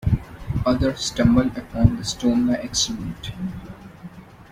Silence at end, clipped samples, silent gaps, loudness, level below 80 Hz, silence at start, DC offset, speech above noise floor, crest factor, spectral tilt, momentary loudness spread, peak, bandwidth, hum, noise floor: 0.05 s; under 0.1%; none; -22 LUFS; -36 dBFS; 0 s; under 0.1%; 20 dB; 20 dB; -5.5 dB/octave; 22 LU; -2 dBFS; 15 kHz; none; -41 dBFS